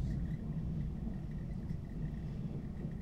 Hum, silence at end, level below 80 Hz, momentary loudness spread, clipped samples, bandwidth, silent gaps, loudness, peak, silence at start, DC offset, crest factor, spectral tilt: none; 0 s; -44 dBFS; 3 LU; under 0.1%; 8 kHz; none; -42 LUFS; -26 dBFS; 0 s; under 0.1%; 12 dB; -9.5 dB/octave